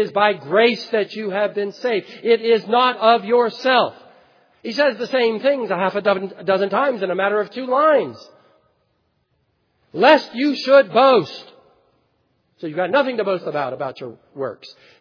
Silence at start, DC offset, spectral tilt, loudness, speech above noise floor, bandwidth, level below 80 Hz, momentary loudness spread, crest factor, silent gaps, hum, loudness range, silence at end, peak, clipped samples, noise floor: 0 s; under 0.1%; -5.5 dB/octave; -18 LUFS; 49 dB; 5.4 kHz; -76 dBFS; 15 LU; 20 dB; none; none; 4 LU; 0.3 s; 0 dBFS; under 0.1%; -67 dBFS